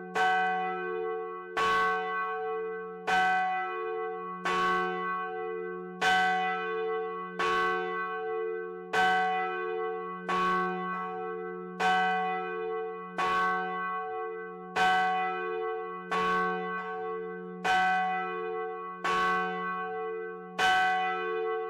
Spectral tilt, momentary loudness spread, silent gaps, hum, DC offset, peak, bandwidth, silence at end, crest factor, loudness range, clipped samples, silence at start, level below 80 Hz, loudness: -4 dB/octave; 10 LU; none; none; under 0.1%; -16 dBFS; 14.5 kHz; 0 s; 14 dB; 1 LU; under 0.1%; 0 s; -66 dBFS; -30 LUFS